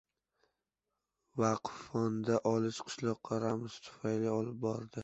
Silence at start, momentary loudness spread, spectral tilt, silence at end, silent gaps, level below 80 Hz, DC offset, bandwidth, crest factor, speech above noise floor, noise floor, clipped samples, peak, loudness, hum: 1.35 s; 7 LU; -6.5 dB/octave; 0 s; none; -72 dBFS; under 0.1%; 8 kHz; 20 dB; 53 dB; -89 dBFS; under 0.1%; -18 dBFS; -36 LUFS; none